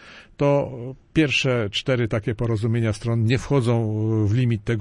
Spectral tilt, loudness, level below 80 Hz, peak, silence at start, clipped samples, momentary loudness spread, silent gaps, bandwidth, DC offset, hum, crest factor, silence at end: -6.5 dB/octave; -22 LUFS; -46 dBFS; -8 dBFS; 0 s; under 0.1%; 5 LU; none; 11 kHz; under 0.1%; none; 14 dB; 0 s